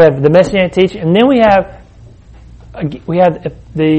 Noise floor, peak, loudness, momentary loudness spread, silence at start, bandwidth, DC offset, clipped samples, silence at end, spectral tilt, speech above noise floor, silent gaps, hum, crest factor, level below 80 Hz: -38 dBFS; 0 dBFS; -11 LUFS; 15 LU; 0 s; 8.8 kHz; under 0.1%; under 0.1%; 0 s; -7.5 dB/octave; 27 dB; none; none; 12 dB; -38 dBFS